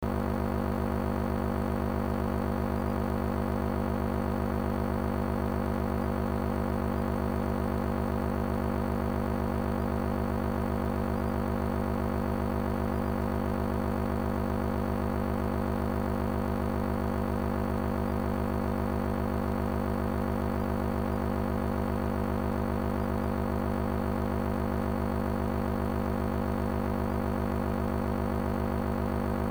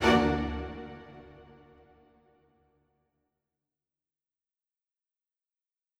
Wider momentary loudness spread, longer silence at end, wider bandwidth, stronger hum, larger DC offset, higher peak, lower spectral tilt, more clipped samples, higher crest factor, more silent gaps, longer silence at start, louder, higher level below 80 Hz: second, 0 LU vs 26 LU; second, 0 s vs 4.55 s; first, over 20 kHz vs 15 kHz; first, 50 Hz at -60 dBFS vs none; first, 0.6% vs under 0.1%; second, -16 dBFS vs -10 dBFS; first, -8 dB/octave vs -5.5 dB/octave; neither; second, 14 dB vs 26 dB; neither; about the same, 0 s vs 0 s; about the same, -31 LUFS vs -30 LUFS; first, -38 dBFS vs -50 dBFS